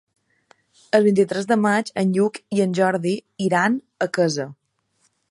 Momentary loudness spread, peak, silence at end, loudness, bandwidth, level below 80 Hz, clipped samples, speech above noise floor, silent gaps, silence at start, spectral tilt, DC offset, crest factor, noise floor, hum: 7 LU; -4 dBFS; 0.8 s; -21 LUFS; 11.5 kHz; -70 dBFS; under 0.1%; 47 dB; none; 0.95 s; -6 dB/octave; under 0.1%; 18 dB; -67 dBFS; none